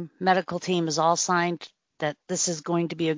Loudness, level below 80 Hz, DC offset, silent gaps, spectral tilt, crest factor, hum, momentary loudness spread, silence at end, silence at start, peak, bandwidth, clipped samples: -25 LUFS; -70 dBFS; under 0.1%; none; -4 dB/octave; 18 dB; none; 9 LU; 0 s; 0 s; -6 dBFS; 7.8 kHz; under 0.1%